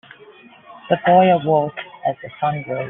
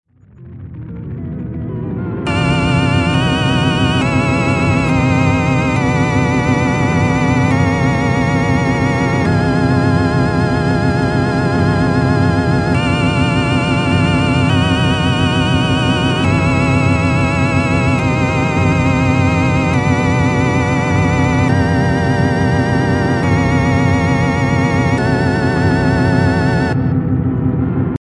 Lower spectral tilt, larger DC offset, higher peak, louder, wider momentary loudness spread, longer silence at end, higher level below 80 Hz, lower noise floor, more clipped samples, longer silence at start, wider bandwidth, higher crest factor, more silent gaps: second, -5 dB/octave vs -6.5 dB/octave; neither; about the same, -2 dBFS vs 0 dBFS; second, -18 LUFS vs -14 LUFS; first, 12 LU vs 3 LU; about the same, 0 s vs 0.05 s; second, -62 dBFS vs -32 dBFS; first, -45 dBFS vs -38 dBFS; neither; first, 0.7 s vs 0.4 s; second, 3.9 kHz vs 11 kHz; about the same, 16 dB vs 12 dB; neither